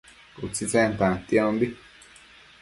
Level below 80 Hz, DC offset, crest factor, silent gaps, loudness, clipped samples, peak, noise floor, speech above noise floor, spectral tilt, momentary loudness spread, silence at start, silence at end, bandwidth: -52 dBFS; under 0.1%; 20 dB; none; -24 LUFS; under 0.1%; -6 dBFS; -51 dBFS; 27 dB; -5 dB/octave; 13 LU; 0.35 s; 0.85 s; 11.5 kHz